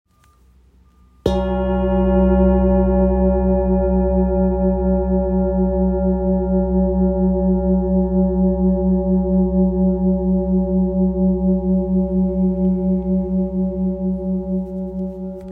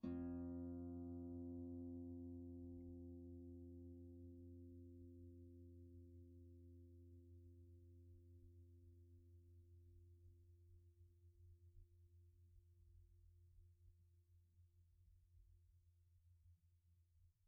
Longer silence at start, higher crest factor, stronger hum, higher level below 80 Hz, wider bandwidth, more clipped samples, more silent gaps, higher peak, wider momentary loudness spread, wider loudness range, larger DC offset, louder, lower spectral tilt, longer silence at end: first, 1.25 s vs 0 s; second, 14 dB vs 20 dB; neither; first, -26 dBFS vs -72 dBFS; first, 3.9 kHz vs 1.6 kHz; neither; neither; first, -2 dBFS vs -38 dBFS; second, 6 LU vs 17 LU; second, 2 LU vs 15 LU; neither; first, -18 LUFS vs -57 LUFS; about the same, -11 dB/octave vs -10 dB/octave; about the same, 0 s vs 0 s